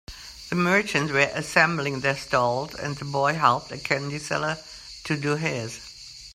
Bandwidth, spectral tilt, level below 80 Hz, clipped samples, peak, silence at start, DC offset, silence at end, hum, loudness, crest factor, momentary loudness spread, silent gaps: 15.5 kHz; -4.5 dB/octave; -54 dBFS; under 0.1%; -2 dBFS; 0.1 s; under 0.1%; 0 s; none; -24 LUFS; 24 dB; 17 LU; none